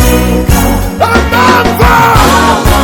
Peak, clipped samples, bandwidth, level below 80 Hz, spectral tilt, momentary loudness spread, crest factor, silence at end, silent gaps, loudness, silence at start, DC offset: 0 dBFS; 5%; over 20 kHz; -14 dBFS; -5 dB/octave; 4 LU; 6 dB; 0 s; none; -7 LUFS; 0 s; under 0.1%